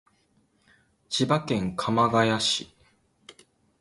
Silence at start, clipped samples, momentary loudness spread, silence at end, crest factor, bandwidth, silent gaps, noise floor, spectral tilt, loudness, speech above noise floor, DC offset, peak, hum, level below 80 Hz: 1.1 s; under 0.1%; 8 LU; 0.5 s; 20 dB; 11.5 kHz; none; -67 dBFS; -4.5 dB/octave; -25 LUFS; 42 dB; under 0.1%; -8 dBFS; none; -58 dBFS